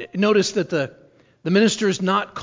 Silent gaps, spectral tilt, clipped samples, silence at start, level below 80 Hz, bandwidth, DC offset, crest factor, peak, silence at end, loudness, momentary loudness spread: none; -5 dB/octave; under 0.1%; 0 s; -62 dBFS; 7.6 kHz; under 0.1%; 16 dB; -6 dBFS; 0 s; -20 LUFS; 9 LU